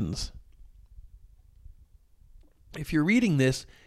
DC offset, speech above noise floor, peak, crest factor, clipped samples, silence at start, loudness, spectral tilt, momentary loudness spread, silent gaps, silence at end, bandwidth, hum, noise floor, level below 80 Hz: under 0.1%; 31 dB; -12 dBFS; 20 dB; under 0.1%; 0 s; -26 LUFS; -6 dB/octave; 17 LU; none; 0.2 s; 14 kHz; none; -57 dBFS; -48 dBFS